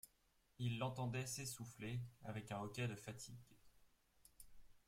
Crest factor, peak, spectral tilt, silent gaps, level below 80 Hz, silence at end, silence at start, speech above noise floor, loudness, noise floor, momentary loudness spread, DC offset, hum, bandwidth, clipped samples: 20 dB; -30 dBFS; -5 dB/octave; none; -74 dBFS; 0.1 s; 0.05 s; 31 dB; -48 LUFS; -79 dBFS; 21 LU; under 0.1%; none; 16.5 kHz; under 0.1%